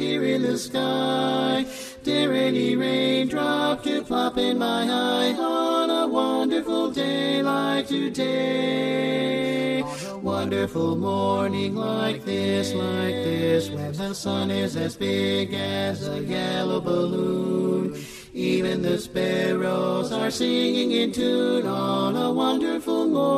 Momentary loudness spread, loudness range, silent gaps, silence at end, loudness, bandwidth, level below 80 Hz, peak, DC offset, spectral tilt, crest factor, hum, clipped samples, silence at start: 5 LU; 2 LU; none; 0 s; -24 LUFS; 14.5 kHz; -58 dBFS; -10 dBFS; under 0.1%; -5.5 dB/octave; 14 dB; none; under 0.1%; 0 s